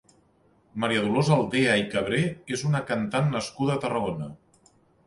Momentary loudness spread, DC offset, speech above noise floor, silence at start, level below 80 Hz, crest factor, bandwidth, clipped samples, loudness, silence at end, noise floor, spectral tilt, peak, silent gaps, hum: 9 LU; under 0.1%; 38 dB; 0.75 s; -58 dBFS; 18 dB; 11.5 kHz; under 0.1%; -25 LUFS; 0.7 s; -63 dBFS; -5.5 dB/octave; -10 dBFS; none; none